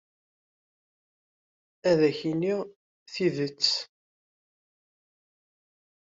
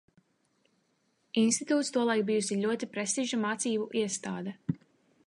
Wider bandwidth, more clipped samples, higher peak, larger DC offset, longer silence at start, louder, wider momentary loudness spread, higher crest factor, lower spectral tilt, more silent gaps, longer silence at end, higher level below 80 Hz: second, 7.8 kHz vs 11.5 kHz; neither; first, -10 dBFS vs -14 dBFS; neither; first, 1.85 s vs 1.35 s; first, -27 LUFS vs -30 LUFS; first, 15 LU vs 10 LU; about the same, 22 dB vs 18 dB; about the same, -5 dB/octave vs -4 dB/octave; first, 2.76-3.06 s vs none; first, 2.2 s vs 0.5 s; about the same, -74 dBFS vs -74 dBFS